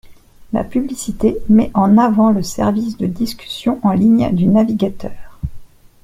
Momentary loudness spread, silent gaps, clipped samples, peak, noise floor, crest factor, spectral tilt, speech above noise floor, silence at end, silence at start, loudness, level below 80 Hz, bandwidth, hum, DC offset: 16 LU; none; under 0.1%; -2 dBFS; -39 dBFS; 14 dB; -7 dB/octave; 25 dB; 0.4 s; 0.05 s; -15 LUFS; -38 dBFS; 15 kHz; none; under 0.1%